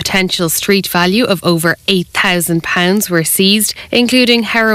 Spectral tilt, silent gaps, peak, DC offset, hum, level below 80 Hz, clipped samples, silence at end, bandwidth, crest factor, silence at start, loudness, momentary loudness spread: -3.5 dB/octave; none; 0 dBFS; under 0.1%; none; -44 dBFS; under 0.1%; 0 s; 16.5 kHz; 12 dB; 0 s; -12 LUFS; 4 LU